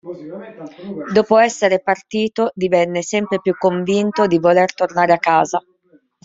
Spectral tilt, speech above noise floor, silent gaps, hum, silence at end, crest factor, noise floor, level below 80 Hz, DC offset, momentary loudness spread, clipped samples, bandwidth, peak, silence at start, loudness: -5 dB/octave; 37 dB; none; none; 0.65 s; 16 dB; -53 dBFS; -60 dBFS; under 0.1%; 18 LU; under 0.1%; 7.8 kHz; 0 dBFS; 0.05 s; -16 LUFS